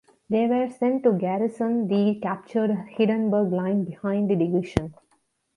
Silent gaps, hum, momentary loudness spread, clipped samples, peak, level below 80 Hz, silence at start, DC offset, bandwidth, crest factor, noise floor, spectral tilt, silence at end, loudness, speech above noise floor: none; none; 5 LU; under 0.1%; -4 dBFS; -52 dBFS; 0.3 s; under 0.1%; 10.5 kHz; 20 dB; -69 dBFS; -8.5 dB/octave; 0.65 s; -24 LUFS; 45 dB